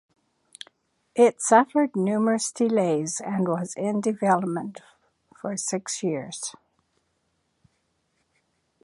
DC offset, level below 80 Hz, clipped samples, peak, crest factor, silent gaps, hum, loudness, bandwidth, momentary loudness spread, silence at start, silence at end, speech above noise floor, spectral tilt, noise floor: under 0.1%; -74 dBFS; under 0.1%; -4 dBFS; 22 dB; none; none; -24 LUFS; 11.5 kHz; 17 LU; 1.15 s; 2.35 s; 49 dB; -5 dB/octave; -73 dBFS